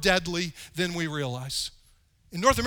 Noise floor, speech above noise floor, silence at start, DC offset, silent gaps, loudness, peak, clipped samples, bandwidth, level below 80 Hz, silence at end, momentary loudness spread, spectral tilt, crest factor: -61 dBFS; 34 dB; 0 s; under 0.1%; none; -29 LUFS; -6 dBFS; under 0.1%; over 20 kHz; -46 dBFS; 0 s; 10 LU; -3.5 dB/octave; 22 dB